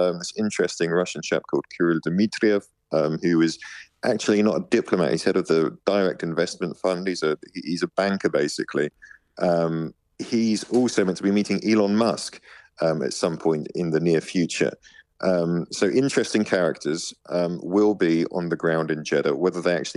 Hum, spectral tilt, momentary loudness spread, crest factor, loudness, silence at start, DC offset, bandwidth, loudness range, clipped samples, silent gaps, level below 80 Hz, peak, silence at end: none; -5.5 dB/octave; 6 LU; 18 dB; -23 LUFS; 0 s; under 0.1%; 11.5 kHz; 2 LU; under 0.1%; none; -66 dBFS; -6 dBFS; 0.05 s